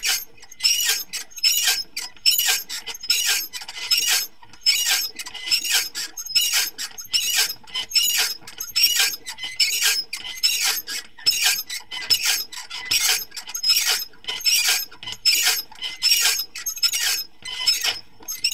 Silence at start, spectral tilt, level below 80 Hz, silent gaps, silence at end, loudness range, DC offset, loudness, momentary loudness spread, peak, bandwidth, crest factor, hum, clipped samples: 0 s; 3.5 dB/octave; -60 dBFS; none; 0 s; 1 LU; 0.7%; -20 LUFS; 13 LU; -4 dBFS; 17 kHz; 20 dB; none; under 0.1%